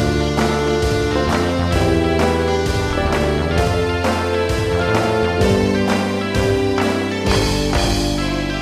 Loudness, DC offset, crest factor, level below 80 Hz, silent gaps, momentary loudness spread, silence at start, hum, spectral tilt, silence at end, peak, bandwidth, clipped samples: -17 LUFS; under 0.1%; 14 dB; -28 dBFS; none; 3 LU; 0 s; none; -5.5 dB/octave; 0 s; -2 dBFS; 15.5 kHz; under 0.1%